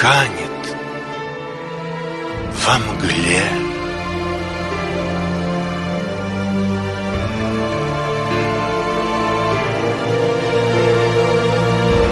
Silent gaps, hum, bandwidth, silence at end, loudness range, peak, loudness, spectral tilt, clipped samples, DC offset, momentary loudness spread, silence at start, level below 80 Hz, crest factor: none; none; 11.5 kHz; 0 s; 4 LU; 0 dBFS; -19 LUFS; -5 dB/octave; under 0.1%; under 0.1%; 11 LU; 0 s; -36 dBFS; 18 dB